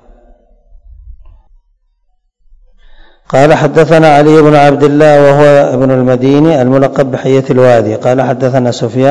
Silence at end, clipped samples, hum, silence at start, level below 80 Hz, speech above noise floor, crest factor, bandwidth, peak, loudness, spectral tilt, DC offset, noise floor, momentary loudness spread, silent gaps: 0 s; 7%; none; 0.9 s; -38 dBFS; 50 dB; 8 dB; 11 kHz; 0 dBFS; -7 LUFS; -7 dB/octave; under 0.1%; -56 dBFS; 6 LU; none